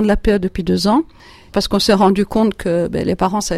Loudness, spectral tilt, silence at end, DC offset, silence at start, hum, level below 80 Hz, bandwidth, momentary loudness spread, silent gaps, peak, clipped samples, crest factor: -16 LUFS; -5.5 dB/octave; 0 s; under 0.1%; 0 s; none; -32 dBFS; 14.5 kHz; 6 LU; none; -2 dBFS; under 0.1%; 14 dB